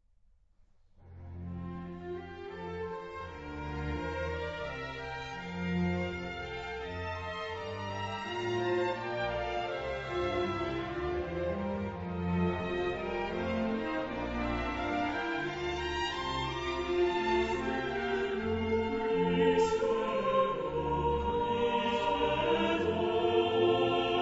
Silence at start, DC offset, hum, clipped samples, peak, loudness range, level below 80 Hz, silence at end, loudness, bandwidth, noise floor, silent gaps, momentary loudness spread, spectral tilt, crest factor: 1 s; under 0.1%; none; under 0.1%; -16 dBFS; 9 LU; -50 dBFS; 0 s; -33 LUFS; 8 kHz; -65 dBFS; none; 11 LU; -6 dB/octave; 18 dB